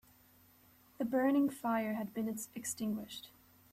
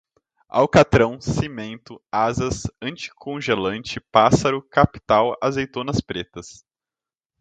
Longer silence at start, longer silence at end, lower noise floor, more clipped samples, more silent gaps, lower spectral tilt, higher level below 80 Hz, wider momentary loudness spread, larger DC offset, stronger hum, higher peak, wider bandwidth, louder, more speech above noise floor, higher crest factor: first, 1 s vs 0.55 s; second, 0.45 s vs 0.9 s; second, -65 dBFS vs under -90 dBFS; neither; neither; about the same, -4.5 dB/octave vs -5.5 dB/octave; second, -74 dBFS vs -42 dBFS; about the same, 14 LU vs 15 LU; neither; neither; second, -20 dBFS vs 0 dBFS; first, 15 kHz vs 9.4 kHz; second, -36 LUFS vs -21 LUFS; second, 30 dB vs over 69 dB; about the same, 18 dB vs 20 dB